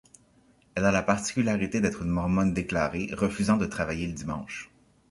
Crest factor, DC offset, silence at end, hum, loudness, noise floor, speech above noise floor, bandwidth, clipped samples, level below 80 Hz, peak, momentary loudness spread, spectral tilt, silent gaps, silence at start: 20 dB; under 0.1%; 0.45 s; none; -27 LUFS; -62 dBFS; 35 dB; 11.5 kHz; under 0.1%; -46 dBFS; -6 dBFS; 10 LU; -6 dB/octave; none; 0.75 s